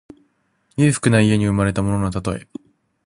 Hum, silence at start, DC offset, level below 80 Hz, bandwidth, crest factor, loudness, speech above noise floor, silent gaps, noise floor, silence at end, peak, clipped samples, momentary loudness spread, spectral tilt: none; 0.8 s; under 0.1%; -40 dBFS; 11.5 kHz; 18 dB; -18 LUFS; 46 dB; none; -64 dBFS; 0.65 s; -2 dBFS; under 0.1%; 17 LU; -6 dB/octave